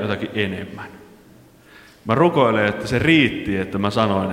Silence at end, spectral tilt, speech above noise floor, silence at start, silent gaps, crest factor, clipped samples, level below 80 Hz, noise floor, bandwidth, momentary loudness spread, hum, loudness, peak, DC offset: 0 s; -6.5 dB/octave; 29 dB; 0 s; none; 18 dB; under 0.1%; -48 dBFS; -48 dBFS; 15.5 kHz; 18 LU; none; -19 LUFS; -2 dBFS; under 0.1%